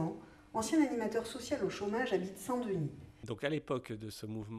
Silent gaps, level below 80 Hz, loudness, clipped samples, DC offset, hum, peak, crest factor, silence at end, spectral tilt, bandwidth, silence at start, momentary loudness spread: none; -66 dBFS; -37 LUFS; under 0.1%; under 0.1%; none; -20 dBFS; 18 dB; 0 s; -5.5 dB/octave; 13.5 kHz; 0 s; 12 LU